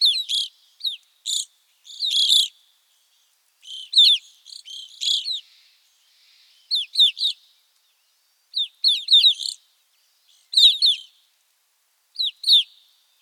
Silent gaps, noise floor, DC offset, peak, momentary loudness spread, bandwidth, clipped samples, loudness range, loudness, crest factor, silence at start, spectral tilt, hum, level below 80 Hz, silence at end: none; -67 dBFS; under 0.1%; -2 dBFS; 23 LU; 18.5 kHz; under 0.1%; 5 LU; -18 LUFS; 20 dB; 0 s; 8 dB/octave; none; under -90 dBFS; 0.6 s